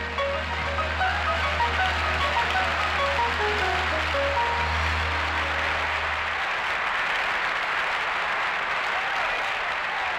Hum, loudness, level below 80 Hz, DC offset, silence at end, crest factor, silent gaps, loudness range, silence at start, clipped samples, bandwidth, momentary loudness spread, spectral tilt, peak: none; -24 LUFS; -38 dBFS; under 0.1%; 0 s; 14 dB; none; 1 LU; 0 s; under 0.1%; 15 kHz; 3 LU; -3.5 dB/octave; -10 dBFS